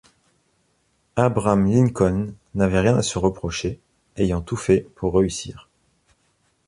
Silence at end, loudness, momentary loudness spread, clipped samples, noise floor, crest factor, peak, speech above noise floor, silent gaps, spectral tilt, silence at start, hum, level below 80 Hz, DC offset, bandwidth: 1.1 s; -21 LUFS; 12 LU; under 0.1%; -66 dBFS; 20 dB; -4 dBFS; 46 dB; none; -6.5 dB/octave; 1.15 s; none; -40 dBFS; under 0.1%; 11.5 kHz